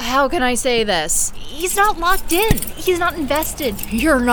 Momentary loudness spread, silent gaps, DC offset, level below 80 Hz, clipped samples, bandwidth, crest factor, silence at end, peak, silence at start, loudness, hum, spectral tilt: 6 LU; none; under 0.1%; -30 dBFS; under 0.1%; over 20 kHz; 18 dB; 0 s; 0 dBFS; 0 s; -18 LUFS; none; -3 dB/octave